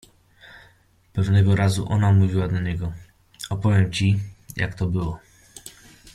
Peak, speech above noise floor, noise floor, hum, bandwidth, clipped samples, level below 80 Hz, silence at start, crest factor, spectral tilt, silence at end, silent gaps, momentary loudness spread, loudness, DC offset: -6 dBFS; 37 dB; -57 dBFS; none; 12.5 kHz; under 0.1%; -46 dBFS; 0.55 s; 16 dB; -6.5 dB/octave; 0.05 s; none; 22 LU; -22 LUFS; under 0.1%